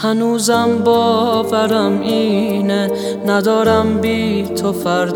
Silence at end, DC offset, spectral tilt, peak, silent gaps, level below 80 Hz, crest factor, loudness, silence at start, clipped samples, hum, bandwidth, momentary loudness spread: 0 s; under 0.1%; -5 dB/octave; 0 dBFS; none; -52 dBFS; 14 dB; -15 LUFS; 0 s; under 0.1%; none; 20 kHz; 5 LU